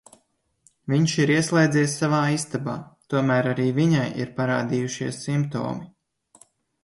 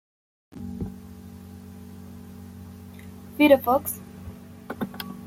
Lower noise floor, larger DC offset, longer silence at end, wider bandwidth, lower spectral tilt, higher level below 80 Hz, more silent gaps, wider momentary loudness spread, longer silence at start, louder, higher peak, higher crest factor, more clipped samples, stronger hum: first, -68 dBFS vs -42 dBFS; neither; first, 1 s vs 0 s; second, 11.5 kHz vs 16.5 kHz; about the same, -5.5 dB/octave vs -5.5 dB/octave; second, -62 dBFS vs -54 dBFS; neither; second, 10 LU vs 25 LU; first, 0.85 s vs 0.55 s; about the same, -23 LUFS vs -24 LUFS; about the same, -6 dBFS vs -4 dBFS; second, 18 dB vs 24 dB; neither; neither